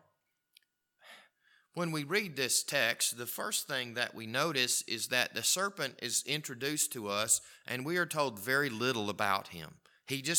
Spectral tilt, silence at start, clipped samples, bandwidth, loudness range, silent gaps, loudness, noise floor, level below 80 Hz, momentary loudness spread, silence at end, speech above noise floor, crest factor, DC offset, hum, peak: -2 dB/octave; 1.05 s; under 0.1%; 19 kHz; 2 LU; none; -32 LUFS; -78 dBFS; -80 dBFS; 8 LU; 0 s; 44 dB; 24 dB; under 0.1%; none; -10 dBFS